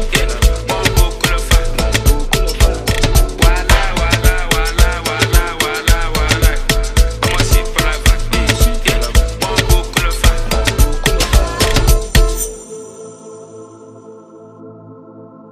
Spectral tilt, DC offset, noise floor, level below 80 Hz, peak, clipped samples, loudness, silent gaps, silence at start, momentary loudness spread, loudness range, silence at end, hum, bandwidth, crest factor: -3.5 dB/octave; under 0.1%; -37 dBFS; -14 dBFS; 0 dBFS; under 0.1%; -14 LUFS; none; 0 s; 4 LU; 4 LU; 0.1 s; none; 16 kHz; 14 dB